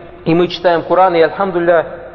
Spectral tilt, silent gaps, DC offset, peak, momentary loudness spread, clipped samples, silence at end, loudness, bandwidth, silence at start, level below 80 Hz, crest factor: -7.5 dB/octave; none; under 0.1%; 0 dBFS; 4 LU; under 0.1%; 0 s; -13 LUFS; 6 kHz; 0 s; -46 dBFS; 14 dB